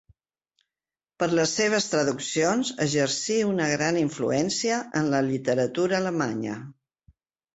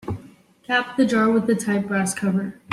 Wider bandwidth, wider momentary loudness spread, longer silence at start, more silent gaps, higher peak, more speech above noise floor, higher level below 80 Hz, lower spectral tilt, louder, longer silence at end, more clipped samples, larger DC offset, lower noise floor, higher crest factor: second, 8.4 kHz vs 13.5 kHz; second, 4 LU vs 7 LU; first, 1.2 s vs 0.05 s; neither; second, -10 dBFS vs -6 dBFS; first, over 65 dB vs 27 dB; about the same, -64 dBFS vs -60 dBFS; about the same, -4 dB/octave vs -5 dB/octave; second, -25 LUFS vs -21 LUFS; first, 0.8 s vs 0 s; neither; neither; first, under -90 dBFS vs -48 dBFS; about the same, 16 dB vs 16 dB